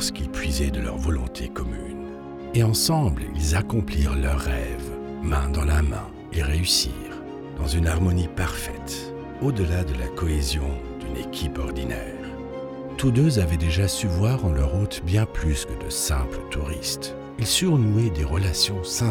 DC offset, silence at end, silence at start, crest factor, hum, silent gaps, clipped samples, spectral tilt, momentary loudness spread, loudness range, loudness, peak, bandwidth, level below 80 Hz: under 0.1%; 0 s; 0 s; 16 dB; none; none; under 0.1%; -5 dB/octave; 13 LU; 4 LU; -25 LUFS; -8 dBFS; 19.5 kHz; -30 dBFS